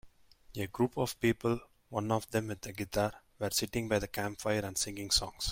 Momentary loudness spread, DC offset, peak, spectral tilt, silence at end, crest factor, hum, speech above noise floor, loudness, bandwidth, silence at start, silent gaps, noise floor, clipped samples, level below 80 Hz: 10 LU; under 0.1%; -14 dBFS; -4 dB/octave; 0 s; 20 dB; none; 24 dB; -34 LUFS; 16.5 kHz; 0.05 s; none; -58 dBFS; under 0.1%; -54 dBFS